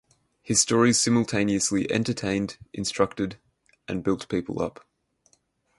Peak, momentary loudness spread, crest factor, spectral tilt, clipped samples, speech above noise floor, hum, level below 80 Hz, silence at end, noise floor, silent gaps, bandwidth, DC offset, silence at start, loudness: -6 dBFS; 12 LU; 20 dB; -4 dB/octave; under 0.1%; 43 dB; none; -54 dBFS; 1.1 s; -67 dBFS; none; 11.5 kHz; under 0.1%; 0.45 s; -25 LUFS